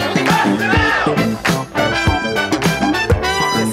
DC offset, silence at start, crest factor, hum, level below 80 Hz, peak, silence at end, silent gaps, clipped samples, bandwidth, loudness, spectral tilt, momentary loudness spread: under 0.1%; 0 s; 14 dB; none; -30 dBFS; -2 dBFS; 0 s; none; under 0.1%; 16 kHz; -15 LUFS; -4.5 dB/octave; 4 LU